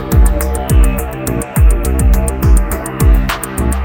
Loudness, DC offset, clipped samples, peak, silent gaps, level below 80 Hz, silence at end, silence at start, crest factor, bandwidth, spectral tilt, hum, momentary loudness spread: -14 LUFS; under 0.1%; under 0.1%; 0 dBFS; none; -12 dBFS; 0 s; 0 s; 10 dB; 18 kHz; -6 dB/octave; none; 6 LU